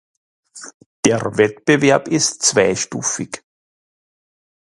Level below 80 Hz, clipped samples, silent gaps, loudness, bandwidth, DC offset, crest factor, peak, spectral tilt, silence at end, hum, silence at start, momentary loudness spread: -56 dBFS; under 0.1%; 0.74-0.80 s, 0.86-1.03 s; -16 LUFS; 11.5 kHz; under 0.1%; 20 dB; 0 dBFS; -3.5 dB/octave; 1.3 s; none; 0.55 s; 20 LU